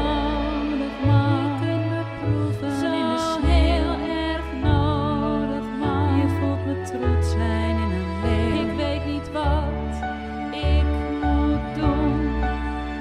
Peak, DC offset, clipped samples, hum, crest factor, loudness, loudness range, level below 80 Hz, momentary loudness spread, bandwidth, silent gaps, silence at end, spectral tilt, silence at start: -6 dBFS; under 0.1%; under 0.1%; none; 16 dB; -23 LUFS; 2 LU; -28 dBFS; 6 LU; 11 kHz; none; 0 s; -7.5 dB/octave; 0 s